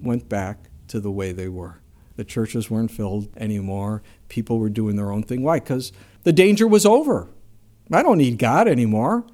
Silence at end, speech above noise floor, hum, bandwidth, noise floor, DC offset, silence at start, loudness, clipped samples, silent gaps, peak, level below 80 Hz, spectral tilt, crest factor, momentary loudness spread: 0.1 s; 28 dB; none; 16 kHz; -48 dBFS; under 0.1%; 0 s; -20 LUFS; under 0.1%; none; 0 dBFS; -50 dBFS; -6 dB/octave; 20 dB; 17 LU